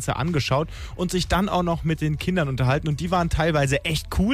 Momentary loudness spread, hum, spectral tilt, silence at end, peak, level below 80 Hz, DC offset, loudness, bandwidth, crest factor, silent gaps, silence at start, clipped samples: 4 LU; none; -5.5 dB/octave; 0 s; -10 dBFS; -34 dBFS; under 0.1%; -23 LUFS; 15.5 kHz; 12 dB; none; 0 s; under 0.1%